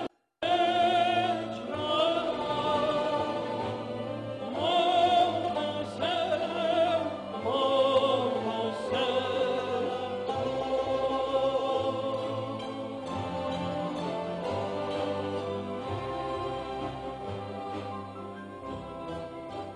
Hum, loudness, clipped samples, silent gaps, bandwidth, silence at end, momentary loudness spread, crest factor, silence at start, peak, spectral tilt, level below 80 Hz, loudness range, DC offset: none; -30 LUFS; under 0.1%; none; 11.5 kHz; 0 s; 13 LU; 16 dB; 0 s; -14 dBFS; -5.5 dB/octave; -58 dBFS; 7 LU; under 0.1%